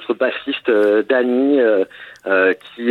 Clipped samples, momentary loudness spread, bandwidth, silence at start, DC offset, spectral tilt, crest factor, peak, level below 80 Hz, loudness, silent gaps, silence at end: under 0.1%; 7 LU; 5.4 kHz; 0 s; under 0.1%; -6 dB/octave; 14 dB; -2 dBFS; -68 dBFS; -17 LUFS; none; 0 s